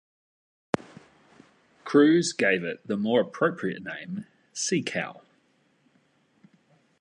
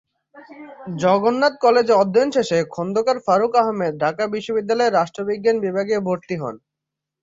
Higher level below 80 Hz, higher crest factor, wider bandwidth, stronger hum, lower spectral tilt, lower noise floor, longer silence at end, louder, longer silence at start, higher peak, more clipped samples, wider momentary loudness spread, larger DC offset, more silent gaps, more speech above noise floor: second, -72 dBFS vs -64 dBFS; first, 24 dB vs 16 dB; first, 11 kHz vs 7.8 kHz; neither; about the same, -4.5 dB/octave vs -5.5 dB/octave; second, -67 dBFS vs -84 dBFS; first, 1.9 s vs 0.65 s; second, -26 LUFS vs -19 LUFS; first, 0.8 s vs 0.35 s; about the same, -6 dBFS vs -4 dBFS; neither; first, 17 LU vs 9 LU; neither; neither; second, 42 dB vs 65 dB